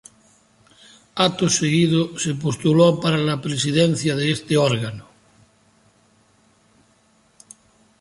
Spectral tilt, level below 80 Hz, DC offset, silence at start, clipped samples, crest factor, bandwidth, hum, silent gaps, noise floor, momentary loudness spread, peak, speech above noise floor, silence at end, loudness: -5 dB/octave; -58 dBFS; under 0.1%; 1.15 s; under 0.1%; 20 dB; 11.5 kHz; none; none; -59 dBFS; 8 LU; -2 dBFS; 40 dB; 3 s; -19 LUFS